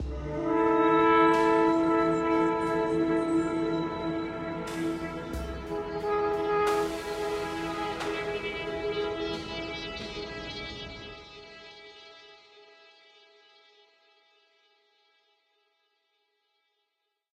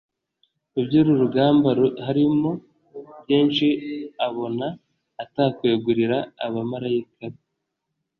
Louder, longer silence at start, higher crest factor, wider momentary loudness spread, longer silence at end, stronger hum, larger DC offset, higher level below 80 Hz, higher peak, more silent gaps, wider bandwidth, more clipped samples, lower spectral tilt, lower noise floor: second, -28 LUFS vs -22 LUFS; second, 0 s vs 0.75 s; about the same, 20 dB vs 16 dB; about the same, 18 LU vs 20 LU; first, 4.75 s vs 0.85 s; neither; neither; first, -50 dBFS vs -62 dBFS; second, -10 dBFS vs -6 dBFS; neither; first, 13.5 kHz vs 5.8 kHz; neither; second, -6 dB/octave vs -9 dB/octave; about the same, -81 dBFS vs -79 dBFS